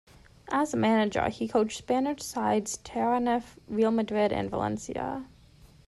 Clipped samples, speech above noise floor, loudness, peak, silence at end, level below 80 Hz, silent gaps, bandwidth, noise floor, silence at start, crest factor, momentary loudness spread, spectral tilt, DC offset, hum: under 0.1%; 28 dB; -28 LUFS; -12 dBFS; 0.2 s; -56 dBFS; none; 12.5 kHz; -55 dBFS; 0.45 s; 16 dB; 9 LU; -5 dB/octave; under 0.1%; none